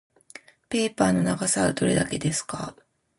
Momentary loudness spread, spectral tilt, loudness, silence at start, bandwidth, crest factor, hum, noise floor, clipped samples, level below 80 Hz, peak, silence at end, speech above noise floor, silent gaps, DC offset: 11 LU; -4.5 dB/octave; -24 LUFS; 0.7 s; 11.5 kHz; 20 dB; none; -49 dBFS; under 0.1%; -52 dBFS; -6 dBFS; 0.45 s; 25 dB; none; under 0.1%